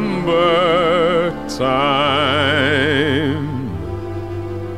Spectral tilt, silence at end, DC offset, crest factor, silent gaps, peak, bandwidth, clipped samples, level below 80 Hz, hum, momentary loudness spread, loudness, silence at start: -6 dB/octave; 0 s; 1%; 14 dB; none; -2 dBFS; 14 kHz; under 0.1%; -40 dBFS; none; 12 LU; -17 LUFS; 0 s